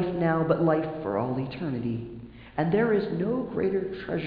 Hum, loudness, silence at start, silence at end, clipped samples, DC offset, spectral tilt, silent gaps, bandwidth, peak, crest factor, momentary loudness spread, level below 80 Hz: none; -27 LUFS; 0 s; 0 s; under 0.1%; under 0.1%; -11 dB/octave; none; 5 kHz; -10 dBFS; 18 dB; 10 LU; -54 dBFS